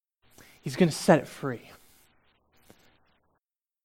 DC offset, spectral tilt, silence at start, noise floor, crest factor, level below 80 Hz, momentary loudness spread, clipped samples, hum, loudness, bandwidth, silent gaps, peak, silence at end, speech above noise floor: under 0.1%; -6 dB/octave; 0.65 s; -82 dBFS; 26 dB; -66 dBFS; 18 LU; under 0.1%; none; -26 LUFS; 16 kHz; none; -6 dBFS; 2.25 s; 56 dB